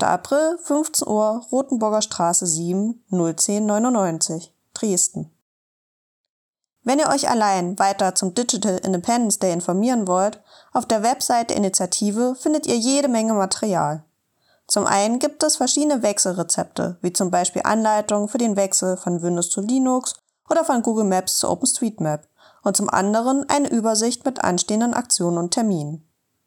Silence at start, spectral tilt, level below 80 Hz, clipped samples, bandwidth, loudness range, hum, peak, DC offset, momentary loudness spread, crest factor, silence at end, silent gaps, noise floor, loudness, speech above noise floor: 0 s; -3.5 dB/octave; -66 dBFS; under 0.1%; 19 kHz; 2 LU; none; -2 dBFS; under 0.1%; 5 LU; 18 dB; 0.45 s; 5.42-6.53 s; -64 dBFS; -20 LUFS; 44 dB